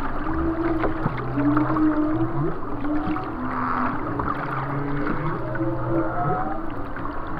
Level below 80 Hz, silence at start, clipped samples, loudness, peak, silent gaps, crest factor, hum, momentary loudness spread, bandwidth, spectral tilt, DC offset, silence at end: -32 dBFS; 0 s; under 0.1%; -25 LUFS; -6 dBFS; none; 16 dB; none; 7 LU; 5 kHz; -10 dB/octave; under 0.1%; 0 s